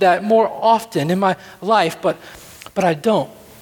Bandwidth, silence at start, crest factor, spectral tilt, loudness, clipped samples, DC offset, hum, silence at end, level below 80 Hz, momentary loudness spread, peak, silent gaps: 19 kHz; 0 s; 16 dB; -5.5 dB/octave; -18 LUFS; under 0.1%; under 0.1%; none; 0.3 s; -58 dBFS; 15 LU; -2 dBFS; none